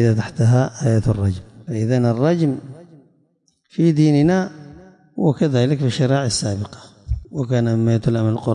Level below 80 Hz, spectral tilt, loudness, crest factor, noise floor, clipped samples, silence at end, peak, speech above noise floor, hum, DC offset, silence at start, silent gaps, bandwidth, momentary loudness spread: -40 dBFS; -7 dB/octave; -19 LUFS; 14 dB; -63 dBFS; under 0.1%; 0 s; -6 dBFS; 46 dB; none; under 0.1%; 0 s; none; 10.5 kHz; 14 LU